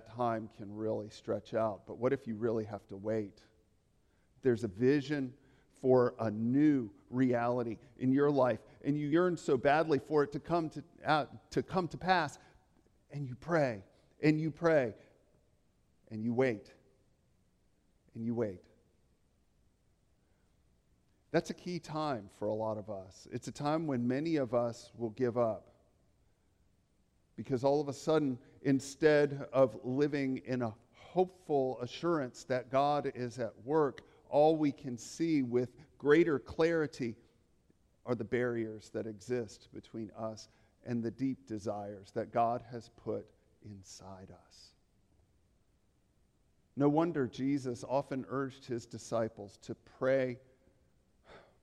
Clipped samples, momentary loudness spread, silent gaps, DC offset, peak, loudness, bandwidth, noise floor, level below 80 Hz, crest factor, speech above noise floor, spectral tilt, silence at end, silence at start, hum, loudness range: under 0.1%; 15 LU; none; under 0.1%; -14 dBFS; -34 LUFS; 12 kHz; -73 dBFS; -70 dBFS; 22 dB; 39 dB; -7 dB/octave; 0.25 s; 0.05 s; none; 9 LU